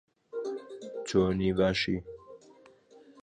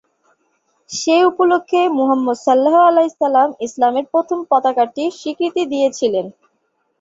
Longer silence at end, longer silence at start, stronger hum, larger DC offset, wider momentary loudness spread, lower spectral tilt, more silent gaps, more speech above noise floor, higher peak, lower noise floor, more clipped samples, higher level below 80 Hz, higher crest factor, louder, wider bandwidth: second, 0 s vs 0.7 s; second, 0.35 s vs 0.9 s; neither; neither; first, 15 LU vs 9 LU; first, -6 dB/octave vs -3.5 dB/octave; neither; second, 30 dB vs 52 dB; second, -12 dBFS vs -2 dBFS; second, -58 dBFS vs -67 dBFS; neither; first, -52 dBFS vs -66 dBFS; first, 20 dB vs 14 dB; second, -30 LUFS vs -16 LUFS; first, 9.6 kHz vs 7.8 kHz